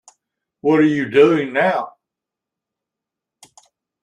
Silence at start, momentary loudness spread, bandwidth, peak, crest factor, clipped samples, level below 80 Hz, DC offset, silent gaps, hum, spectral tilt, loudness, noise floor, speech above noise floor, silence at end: 0.65 s; 10 LU; 9.8 kHz; -2 dBFS; 18 dB; under 0.1%; -64 dBFS; under 0.1%; none; none; -7 dB/octave; -16 LUFS; -85 dBFS; 70 dB; 2.15 s